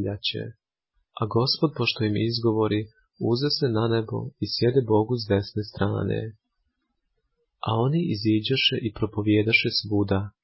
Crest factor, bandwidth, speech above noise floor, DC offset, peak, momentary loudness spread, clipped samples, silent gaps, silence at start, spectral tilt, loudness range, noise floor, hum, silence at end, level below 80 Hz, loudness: 18 dB; 5.8 kHz; 52 dB; under 0.1%; -8 dBFS; 10 LU; under 0.1%; none; 0 s; -9.5 dB/octave; 4 LU; -76 dBFS; none; 0.15 s; -52 dBFS; -24 LUFS